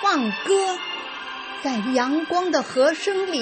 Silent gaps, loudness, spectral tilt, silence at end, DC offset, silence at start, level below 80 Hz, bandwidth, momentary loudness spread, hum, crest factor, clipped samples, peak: none; -23 LUFS; -3 dB/octave; 0 s; under 0.1%; 0 s; -68 dBFS; 8.8 kHz; 10 LU; none; 16 dB; under 0.1%; -8 dBFS